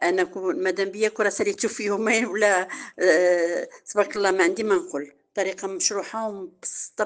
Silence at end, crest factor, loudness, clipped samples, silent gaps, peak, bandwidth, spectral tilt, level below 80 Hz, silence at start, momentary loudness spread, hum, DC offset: 0 s; 18 dB; -24 LUFS; under 0.1%; none; -6 dBFS; 10 kHz; -2.5 dB/octave; -72 dBFS; 0 s; 12 LU; none; under 0.1%